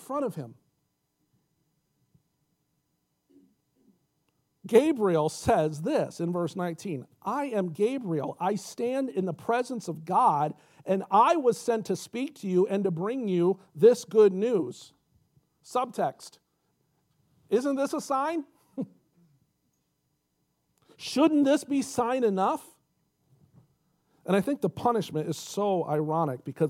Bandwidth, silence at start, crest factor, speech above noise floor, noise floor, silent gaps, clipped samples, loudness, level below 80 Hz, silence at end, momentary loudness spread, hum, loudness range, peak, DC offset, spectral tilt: 16 kHz; 0 s; 22 dB; 50 dB; -77 dBFS; none; under 0.1%; -27 LUFS; -66 dBFS; 0 s; 14 LU; none; 7 LU; -8 dBFS; under 0.1%; -6 dB/octave